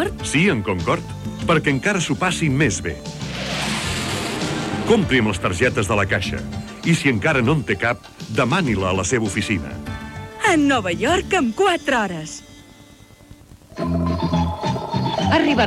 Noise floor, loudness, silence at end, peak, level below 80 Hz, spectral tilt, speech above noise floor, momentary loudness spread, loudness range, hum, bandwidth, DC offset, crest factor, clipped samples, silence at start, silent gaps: -46 dBFS; -20 LUFS; 0 s; -2 dBFS; -42 dBFS; -5 dB/octave; 27 dB; 11 LU; 3 LU; none; 15 kHz; under 0.1%; 18 dB; under 0.1%; 0 s; none